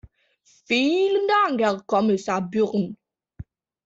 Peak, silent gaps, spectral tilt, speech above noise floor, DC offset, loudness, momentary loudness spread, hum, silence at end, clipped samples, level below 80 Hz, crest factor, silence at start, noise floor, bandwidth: -8 dBFS; none; -5.5 dB/octave; 22 dB; under 0.1%; -22 LUFS; 5 LU; none; 0.45 s; under 0.1%; -58 dBFS; 16 dB; 0.7 s; -44 dBFS; 7.8 kHz